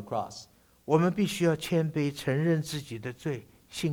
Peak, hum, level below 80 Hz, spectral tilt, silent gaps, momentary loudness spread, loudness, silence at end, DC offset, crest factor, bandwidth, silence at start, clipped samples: -10 dBFS; none; -62 dBFS; -6 dB/octave; none; 14 LU; -29 LUFS; 0 s; under 0.1%; 20 dB; 19 kHz; 0 s; under 0.1%